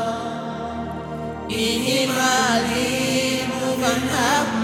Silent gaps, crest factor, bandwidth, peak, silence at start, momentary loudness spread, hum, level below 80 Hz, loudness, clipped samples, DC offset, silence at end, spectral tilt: none; 18 dB; 17 kHz; -2 dBFS; 0 s; 11 LU; none; -46 dBFS; -21 LUFS; under 0.1%; under 0.1%; 0 s; -3 dB/octave